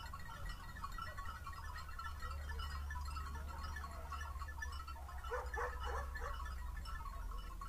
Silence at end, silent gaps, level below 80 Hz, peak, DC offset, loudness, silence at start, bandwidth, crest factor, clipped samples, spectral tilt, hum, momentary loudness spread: 0 s; none; -48 dBFS; -28 dBFS; under 0.1%; -47 LUFS; 0 s; 15.5 kHz; 16 dB; under 0.1%; -4.5 dB/octave; none; 6 LU